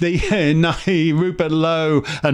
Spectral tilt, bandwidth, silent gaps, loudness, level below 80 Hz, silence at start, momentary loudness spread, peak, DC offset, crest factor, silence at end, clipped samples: -6.5 dB/octave; 10.5 kHz; none; -17 LUFS; -36 dBFS; 0 s; 3 LU; -4 dBFS; under 0.1%; 14 dB; 0 s; under 0.1%